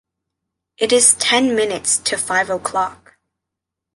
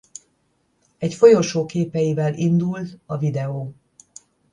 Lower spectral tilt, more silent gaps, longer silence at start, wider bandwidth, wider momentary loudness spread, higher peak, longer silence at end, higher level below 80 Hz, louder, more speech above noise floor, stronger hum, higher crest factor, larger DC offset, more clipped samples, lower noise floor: second, -1 dB/octave vs -7 dB/octave; neither; second, 0.8 s vs 1 s; first, 12 kHz vs 10 kHz; second, 11 LU vs 17 LU; about the same, 0 dBFS vs 0 dBFS; first, 1 s vs 0.8 s; about the same, -56 dBFS vs -60 dBFS; first, -16 LUFS vs -20 LUFS; first, 66 dB vs 48 dB; neither; about the same, 20 dB vs 20 dB; neither; neither; first, -82 dBFS vs -67 dBFS